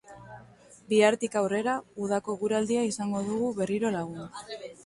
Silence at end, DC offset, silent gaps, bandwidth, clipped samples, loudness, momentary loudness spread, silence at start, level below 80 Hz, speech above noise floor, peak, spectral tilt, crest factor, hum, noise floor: 0.05 s; under 0.1%; none; 11.5 kHz; under 0.1%; -28 LUFS; 17 LU; 0.1 s; -66 dBFS; 26 dB; -8 dBFS; -5 dB/octave; 20 dB; 60 Hz at -55 dBFS; -54 dBFS